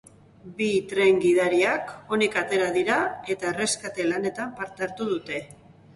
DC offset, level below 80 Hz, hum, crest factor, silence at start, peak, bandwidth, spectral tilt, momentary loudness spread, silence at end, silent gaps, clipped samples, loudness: under 0.1%; -64 dBFS; none; 16 dB; 0.45 s; -8 dBFS; 11.5 kHz; -4 dB/octave; 11 LU; 0.4 s; none; under 0.1%; -25 LUFS